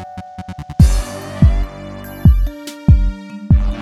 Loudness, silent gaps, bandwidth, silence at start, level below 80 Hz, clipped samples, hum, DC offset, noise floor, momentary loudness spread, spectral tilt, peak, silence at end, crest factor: -16 LUFS; none; 13.5 kHz; 0 s; -18 dBFS; under 0.1%; none; under 0.1%; -30 dBFS; 17 LU; -7.5 dB/octave; 0 dBFS; 0 s; 14 dB